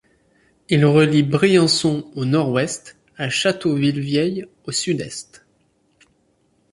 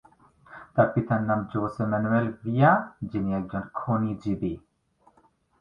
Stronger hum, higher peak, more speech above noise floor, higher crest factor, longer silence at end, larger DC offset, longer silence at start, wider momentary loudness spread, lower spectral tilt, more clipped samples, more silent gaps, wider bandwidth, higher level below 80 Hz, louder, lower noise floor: neither; first, -2 dBFS vs -6 dBFS; first, 44 dB vs 39 dB; about the same, 18 dB vs 22 dB; first, 1.5 s vs 1 s; neither; first, 0.7 s vs 0.5 s; about the same, 12 LU vs 12 LU; second, -5 dB/octave vs -10 dB/octave; neither; neither; first, 11.5 kHz vs 6.8 kHz; about the same, -58 dBFS vs -54 dBFS; first, -19 LUFS vs -26 LUFS; about the same, -63 dBFS vs -64 dBFS